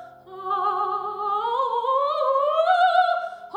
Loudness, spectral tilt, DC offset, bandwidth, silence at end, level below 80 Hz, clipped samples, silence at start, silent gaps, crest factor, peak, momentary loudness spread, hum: -22 LUFS; -3 dB/octave; under 0.1%; 9.2 kHz; 0 s; -74 dBFS; under 0.1%; 0 s; none; 14 dB; -8 dBFS; 9 LU; none